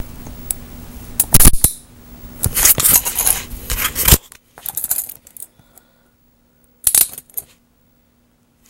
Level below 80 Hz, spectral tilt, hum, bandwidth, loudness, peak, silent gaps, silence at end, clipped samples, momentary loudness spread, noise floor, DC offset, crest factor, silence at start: -26 dBFS; -2 dB/octave; none; over 20 kHz; -14 LUFS; 0 dBFS; none; 1.3 s; 0.2%; 24 LU; -57 dBFS; under 0.1%; 18 dB; 0 s